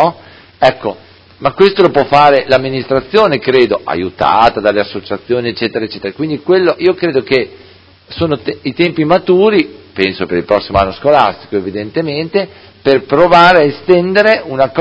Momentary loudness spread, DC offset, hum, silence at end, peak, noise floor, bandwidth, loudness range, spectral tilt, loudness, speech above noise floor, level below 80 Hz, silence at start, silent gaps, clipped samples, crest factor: 11 LU; under 0.1%; none; 0 s; 0 dBFS; -37 dBFS; 8 kHz; 4 LU; -7 dB/octave; -12 LUFS; 26 dB; -40 dBFS; 0 s; none; 0.5%; 12 dB